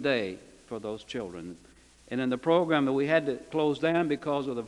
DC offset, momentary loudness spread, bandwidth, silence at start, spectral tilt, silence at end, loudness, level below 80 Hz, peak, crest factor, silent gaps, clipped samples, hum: under 0.1%; 15 LU; 11.5 kHz; 0 s; -6.5 dB/octave; 0 s; -29 LUFS; -64 dBFS; -10 dBFS; 18 dB; none; under 0.1%; none